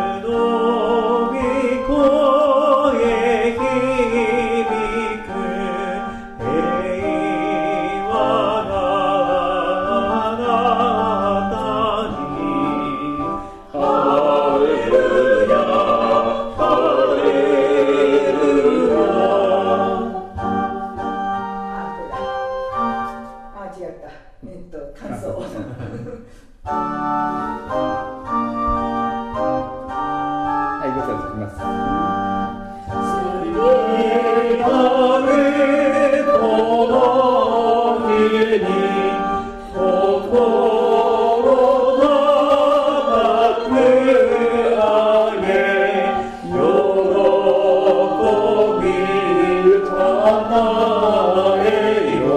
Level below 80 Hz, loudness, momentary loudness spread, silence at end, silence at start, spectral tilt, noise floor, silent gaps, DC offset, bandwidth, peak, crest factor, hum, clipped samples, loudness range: -42 dBFS; -17 LUFS; 11 LU; 0 s; 0 s; -6 dB/octave; -40 dBFS; none; under 0.1%; 11 kHz; -2 dBFS; 14 dB; none; under 0.1%; 9 LU